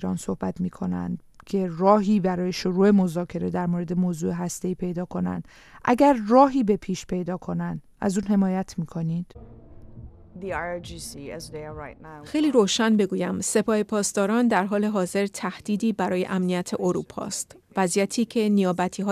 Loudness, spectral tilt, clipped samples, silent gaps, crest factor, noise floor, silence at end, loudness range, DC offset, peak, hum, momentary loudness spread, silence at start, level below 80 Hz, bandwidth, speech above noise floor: -24 LUFS; -5.5 dB/octave; under 0.1%; none; 20 dB; -44 dBFS; 0 s; 6 LU; under 0.1%; -4 dBFS; none; 14 LU; 0 s; -52 dBFS; 14 kHz; 20 dB